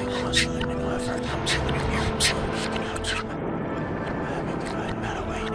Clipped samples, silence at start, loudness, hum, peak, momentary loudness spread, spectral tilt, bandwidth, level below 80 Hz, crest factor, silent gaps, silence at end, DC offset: under 0.1%; 0 s; -26 LUFS; none; -8 dBFS; 7 LU; -4 dB/octave; 11 kHz; -38 dBFS; 18 dB; none; 0 s; under 0.1%